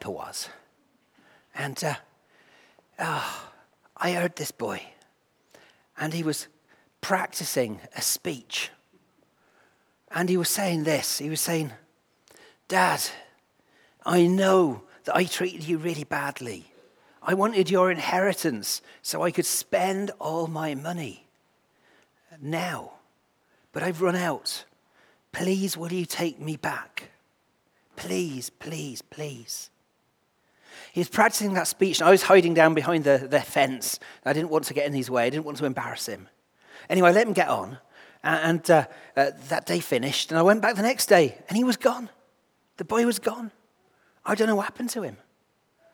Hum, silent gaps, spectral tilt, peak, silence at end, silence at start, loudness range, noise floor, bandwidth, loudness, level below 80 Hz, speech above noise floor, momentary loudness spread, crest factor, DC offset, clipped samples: none; none; -4 dB/octave; -2 dBFS; 0.8 s; 0 s; 12 LU; -70 dBFS; over 20 kHz; -25 LUFS; -74 dBFS; 45 dB; 16 LU; 24 dB; under 0.1%; under 0.1%